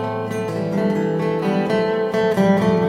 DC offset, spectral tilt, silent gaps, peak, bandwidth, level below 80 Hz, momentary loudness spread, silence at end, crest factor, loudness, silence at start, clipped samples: under 0.1%; -7.5 dB/octave; none; -4 dBFS; 15 kHz; -54 dBFS; 7 LU; 0 s; 14 dB; -20 LUFS; 0 s; under 0.1%